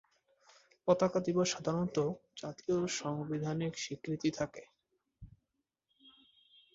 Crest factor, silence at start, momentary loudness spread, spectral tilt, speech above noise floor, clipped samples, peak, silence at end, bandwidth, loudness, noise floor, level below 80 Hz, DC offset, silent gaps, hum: 24 dB; 0.85 s; 10 LU; -5 dB/octave; 51 dB; under 0.1%; -14 dBFS; 0.65 s; 8 kHz; -35 LUFS; -86 dBFS; -68 dBFS; under 0.1%; none; none